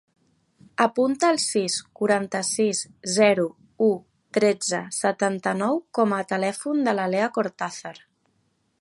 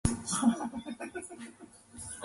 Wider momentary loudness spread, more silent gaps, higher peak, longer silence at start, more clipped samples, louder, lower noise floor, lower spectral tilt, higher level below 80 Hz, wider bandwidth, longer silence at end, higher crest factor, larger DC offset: second, 8 LU vs 20 LU; neither; first, -4 dBFS vs -10 dBFS; first, 0.8 s vs 0.05 s; neither; first, -24 LUFS vs -33 LUFS; first, -69 dBFS vs -53 dBFS; about the same, -3.5 dB/octave vs -4.5 dB/octave; second, -72 dBFS vs -48 dBFS; about the same, 11.5 kHz vs 11.5 kHz; first, 0.85 s vs 0 s; about the same, 20 dB vs 24 dB; neither